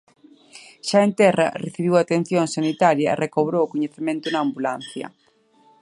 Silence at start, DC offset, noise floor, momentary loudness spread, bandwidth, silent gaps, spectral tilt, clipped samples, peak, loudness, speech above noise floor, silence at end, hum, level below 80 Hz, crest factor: 0.55 s; under 0.1%; -57 dBFS; 12 LU; 11.5 kHz; none; -5.5 dB/octave; under 0.1%; -2 dBFS; -21 LUFS; 37 dB; 0.7 s; none; -68 dBFS; 20 dB